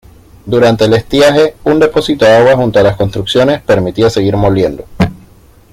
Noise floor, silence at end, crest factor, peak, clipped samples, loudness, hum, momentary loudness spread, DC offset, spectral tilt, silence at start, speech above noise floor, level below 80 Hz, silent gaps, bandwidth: -41 dBFS; 0.55 s; 10 dB; 0 dBFS; under 0.1%; -10 LUFS; none; 8 LU; under 0.1%; -6 dB/octave; 0.45 s; 32 dB; -34 dBFS; none; 15.5 kHz